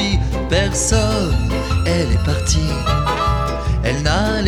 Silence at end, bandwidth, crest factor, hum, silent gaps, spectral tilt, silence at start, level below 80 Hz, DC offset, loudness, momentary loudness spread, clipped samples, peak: 0 s; 13.5 kHz; 14 dB; none; none; -4.5 dB/octave; 0 s; -22 dBFS; under 0.1%; -18 LUFS; 4 LU; under 0.1%; -2 dBFS